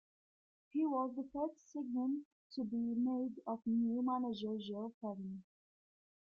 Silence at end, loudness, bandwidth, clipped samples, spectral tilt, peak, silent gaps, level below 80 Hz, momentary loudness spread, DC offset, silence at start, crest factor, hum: 0.95 s; -40 LUFS; 6.8 kHz; under 0.1%; -8 dB/octave; -26 dBFS; 2.25-2.50 s, 4.94-5.01 s; -80 dBFS; 9 LU; under 0.1%; 0.75 s; 14 dB; none